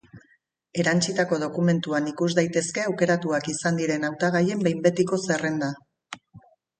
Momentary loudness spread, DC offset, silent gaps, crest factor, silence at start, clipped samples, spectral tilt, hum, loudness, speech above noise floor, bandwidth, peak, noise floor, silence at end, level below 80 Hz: 10 LU; under 0.1%; none; 20 dB; 0.15 s; under 0.1%; -5 dB/octave; none; -24 LUFS; 41 dB; 9.6 kHz; -6 dBFS; -65 dBFS; 0.4 s; -66 dBFS